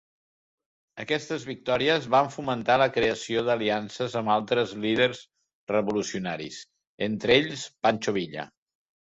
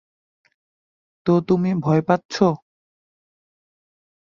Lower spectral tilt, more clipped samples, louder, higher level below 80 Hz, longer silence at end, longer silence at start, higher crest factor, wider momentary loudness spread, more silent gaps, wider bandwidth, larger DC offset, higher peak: second, -4.5 dB/octave vs -7.5 dB/octave; neither; second, -26 LUFS vs -20 LUFS; about the same, -62 dBFS vs -60 dBFS; second, 0.55 s vs 1.65 s; second, 0.95 s vs 1.25 s; about the same, 20 dB vs 20 dB; first, 15 LU vs 6 LU; first, 5.55-5.67 s, 6.87-6.98 s vs 2.25-2.29 s; about the same, 8 kHz vs 7.4 kHz; neither; about the same, -6 dBFS vs -4 dBFS